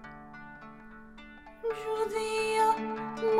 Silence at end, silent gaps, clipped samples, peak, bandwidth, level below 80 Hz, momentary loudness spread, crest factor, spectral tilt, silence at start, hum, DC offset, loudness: 0 s; none; under 0.1%; -14 dBFS; 15 kHz; -60 dBFS; 23 LU; 18 dB; -3.5 dB/octave; 0 s; none; under 0.1%; -31 LUFS